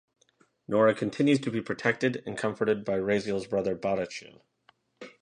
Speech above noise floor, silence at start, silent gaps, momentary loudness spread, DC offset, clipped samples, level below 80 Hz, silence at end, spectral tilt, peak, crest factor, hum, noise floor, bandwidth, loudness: 39 dB; 0.7 s; none; 9 LU; under 0.1%; under 0.1%; -64 dBFS; 0.15 s; -6 dB/octave; -8 dBFS; 20 dB; none; -67 dBFS; 10 kHz; -28 LUFS